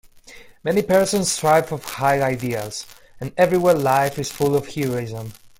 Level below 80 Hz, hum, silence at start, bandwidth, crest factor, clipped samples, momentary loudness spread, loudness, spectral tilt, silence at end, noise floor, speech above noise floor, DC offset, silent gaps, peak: -52 dBFS; none; 0.3 s; 17 kHz; 18 dB; under 0.1%; 14 LU; -20 LUFS; -4.5 dB/octave; 0.1 s; -44 dBFS; 25 dB; under 0.1%; none; -4 dBFS